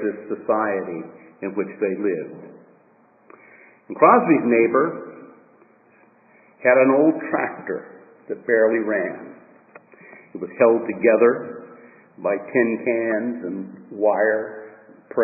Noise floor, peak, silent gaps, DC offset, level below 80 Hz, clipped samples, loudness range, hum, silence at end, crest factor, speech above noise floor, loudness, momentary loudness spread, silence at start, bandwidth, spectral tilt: -56 dBFS; 0 dBFS; none; under 0.1%; -74 dBFS; under 0.1%; 5 LU; none; 0 s; 22 dB; 36 dB; -20 LUFS; 20 LU; 0 s; 2.7 kHz; -14 dB/octave